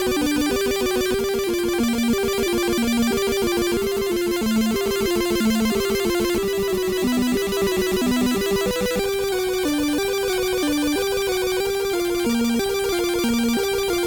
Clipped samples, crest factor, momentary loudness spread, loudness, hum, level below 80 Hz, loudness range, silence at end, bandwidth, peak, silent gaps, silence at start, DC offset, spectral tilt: under 0.1%; 10 dB; 2 LU; -21 LUFS; none; -42 dBFS; 1 LU; 0 s; over 20 kHz; -10 dBFS; none; 0 s; under 0.1%; -4 dB/octave